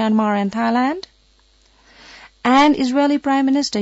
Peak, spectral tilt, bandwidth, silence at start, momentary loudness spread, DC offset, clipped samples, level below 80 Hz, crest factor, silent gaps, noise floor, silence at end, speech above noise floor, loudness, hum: -4 dBFS; -5 dB/octave; 8 kHz; 0 s; 8 LU; under 0.1%; under 0.1%; -56 dBFS; 14 dB; none; -55 dBFS; 0 s; 39 dB; -17 LUFS; none